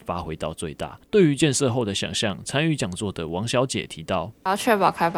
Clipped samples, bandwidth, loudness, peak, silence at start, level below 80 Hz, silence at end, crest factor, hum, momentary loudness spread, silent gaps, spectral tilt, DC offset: under 0.1%; 19 kHz; -24 LUFS; -4 dBFS; 0.05 s; -52 dBFS; 0 s; 18 dB; none; 11 LU; none; -4.5 dB/octave; under 0.1%